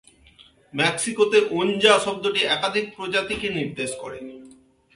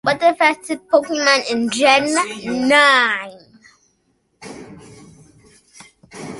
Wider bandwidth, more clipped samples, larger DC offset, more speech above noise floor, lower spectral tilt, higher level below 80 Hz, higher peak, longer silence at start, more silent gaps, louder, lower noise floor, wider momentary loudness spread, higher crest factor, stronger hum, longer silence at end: about the same, 11.5 kHz vs 11.5 kHz; neither; neither; second, 31 dB vs 49 dB; about the same, -3 dB/octave vs -2.5 dB/octave; about the same, -58 dBFS vs -60 dBFS; about the same, -2 dBFS vs 0 dBFS; first, 0.4 s vs 0.05 s; neither; second, -21 LUFS vs -15 LUFS; second, -53 dBFS vs -65 dBFS; second, 16 LU vs 24 LU; about the same, 22 dB vs 18 dB; neither; first, 0.45 s vs 0 s